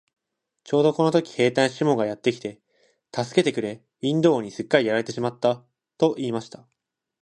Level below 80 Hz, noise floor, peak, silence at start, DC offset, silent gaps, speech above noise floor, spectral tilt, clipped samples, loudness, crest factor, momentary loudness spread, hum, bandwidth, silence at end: -68 dBFS; -66 dBFS; -4 dBFS; 0.65 s; under 0.1%; none; 43 dB; -6 dB/octave; under 0.1%; -23 LUFS; 20 dB; 12 LU; none; 11 kHz; 0.75 s